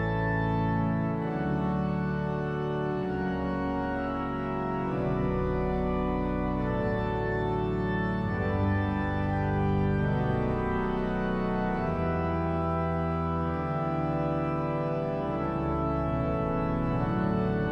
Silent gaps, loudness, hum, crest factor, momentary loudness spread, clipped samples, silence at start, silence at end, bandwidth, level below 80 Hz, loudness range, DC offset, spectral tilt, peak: none; -29 LUFS; none; 12 dB; 3 LU; under 0.1%; 0 s; 0 s; 6.2 kHz; -40 dBFS; 2 LU; under 0.1%; -9.5 dB/octave; -16 dBFS